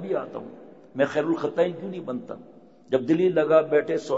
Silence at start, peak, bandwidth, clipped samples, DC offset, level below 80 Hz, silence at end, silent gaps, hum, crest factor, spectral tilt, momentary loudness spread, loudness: 0 s; -6 dBFS; 8 kHz; under 0.1%; 0.1%; -74 dBFS; 0 s; none; none; 18 dB; -7 dB/octave; 19 LU; -24 LUFS